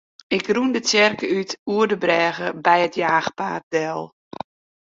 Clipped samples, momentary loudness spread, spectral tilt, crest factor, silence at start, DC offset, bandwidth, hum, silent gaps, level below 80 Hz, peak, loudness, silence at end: under 0.1%; 17 LU; -3.5 dB/octave; 20 dB; 0.3 s; under 0.1%; 7.8 kHz; none; 1.59-1.66 s, 3.63-3.71 s; -64 dBFS; -2 dBFS; -20 LUFS; 0.8 s